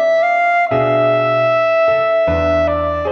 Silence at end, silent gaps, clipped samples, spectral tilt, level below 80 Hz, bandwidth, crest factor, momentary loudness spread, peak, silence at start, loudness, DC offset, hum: 0 s; none; under 0.1%; -7 dB/octave; -36 dBFS; 6.6 kHz; 8 dB; 2 LU; -6 dBFS; 0 s; -14 LUFS; under 0.1%; none